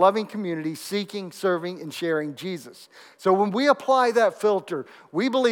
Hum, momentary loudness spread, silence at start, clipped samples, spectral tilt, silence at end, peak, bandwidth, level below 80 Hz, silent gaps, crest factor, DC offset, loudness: none; 13 LU; 0 s; under 0.1%; -5 dB/octave; 0 s; -4 dBFS; 17.5 kHz; -88 dBFS; none; 18 dB; under 0.1%; -24 LUFS